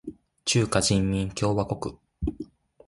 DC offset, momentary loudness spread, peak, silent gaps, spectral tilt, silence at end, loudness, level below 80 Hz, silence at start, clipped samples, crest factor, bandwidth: under 0.1%; 18 LU; -8 dBFS; none; -4.5 dB/octave; 0.4 s; -26 LUFS; -42 dBFS; 0.05 s; under 0.1%; 18 dB; 11.5 kHz